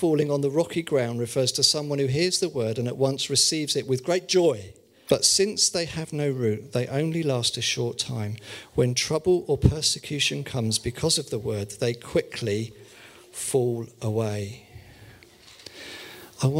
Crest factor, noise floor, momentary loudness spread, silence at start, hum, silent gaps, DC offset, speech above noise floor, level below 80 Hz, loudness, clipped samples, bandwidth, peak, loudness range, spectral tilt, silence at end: 20 dB; -51 dBFS; 13 LU; 0 s; none; none; under 0.1%; 26 dB; -46 dBFS; -24 LUFS; under 0.1%; 16 kHz; -6 dBFS; 7 LU; -4 dB/octave; 0 s